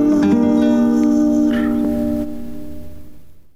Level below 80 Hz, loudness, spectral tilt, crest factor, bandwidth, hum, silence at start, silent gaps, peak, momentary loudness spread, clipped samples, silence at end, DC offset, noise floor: -40 dBFS; -16 LUFS; -7 dB/octave; 10 dB; 16 kHz; none; 0 s; none; -6 dBFS; 18 LU; under 0.1%; 0 s; under 0.1%; -40 dBFS